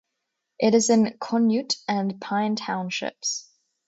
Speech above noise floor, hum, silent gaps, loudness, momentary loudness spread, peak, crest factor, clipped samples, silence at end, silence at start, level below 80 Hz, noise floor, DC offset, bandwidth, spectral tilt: 57 dB; none; none; -24 LUFS; 9 LU; -8 dBFS; 18 dB; under 0.1%; 0.45 s; 0.6 s; -70 dBFS; -80 dBFS; under 0.1%; 8 kHz; -4 dB/octave